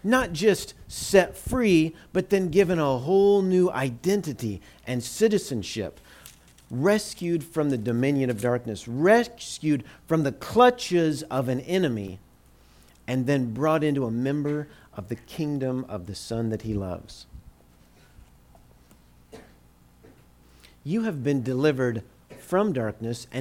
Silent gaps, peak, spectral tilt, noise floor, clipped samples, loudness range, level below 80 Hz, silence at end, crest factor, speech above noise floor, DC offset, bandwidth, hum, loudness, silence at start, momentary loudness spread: none; -6 dBFS; -6 dB/octave; -56 dBFS; under 0.1%; 10 LU; -52 dBFS; 0 s; 20 dB; 31 dB; under 0.1%; 16.5 kHz; 60 Hz at -55 dBFS; -25 LUFS; 0.05 s; 15 LU